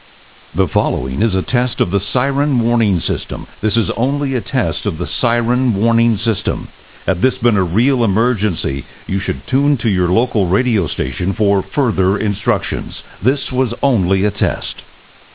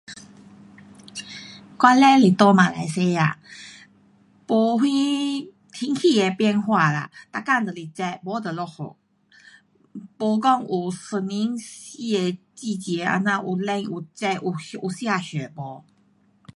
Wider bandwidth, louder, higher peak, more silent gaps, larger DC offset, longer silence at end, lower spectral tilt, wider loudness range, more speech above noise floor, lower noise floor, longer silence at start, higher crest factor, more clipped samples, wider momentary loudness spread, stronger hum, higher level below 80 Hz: second, 4 kHz vs 11.5 kHz; first, -16 LUFS vs -22 LUFS; about the same, 0 dBFS vs -2 dBFS; neither; first, 0.9% vs under 0.1%; second, 0.5 s vs 0.75 s; first, -11.5 dB/octave vs -5.5 dB/octave; second, 1 LU vs 8 LU; second, 30 dB vs 39 dB; second, -45 dBFS vs -61 dBFS; first, 0.55 s vs 0.1 s; second, 16 dB vs 22 dB; neither; second, 7 LU vs 22 LU; neither; first, -32 dBFS vs -68 dBFS